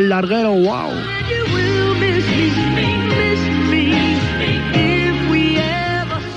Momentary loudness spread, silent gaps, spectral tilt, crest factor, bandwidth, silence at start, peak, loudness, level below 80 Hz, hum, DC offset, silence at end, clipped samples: 4 LU; none; -6.5 dB/octave; 14 dB; 10 kHz; 0 s; -2 dBFS; -16 LUFS; -36 dBFS; none; under 0.1%; 0 s; under 0.1%